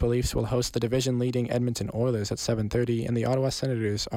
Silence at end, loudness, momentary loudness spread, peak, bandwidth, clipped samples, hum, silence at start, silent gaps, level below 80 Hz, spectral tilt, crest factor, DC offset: 0 s; -27 LUFS; 2 LU; -14 dBFS; 16 kHz; under 0.1%; none; 0 s; none; -42 dBFS; -5.5 dB/octave; 14 dB; under 0.1%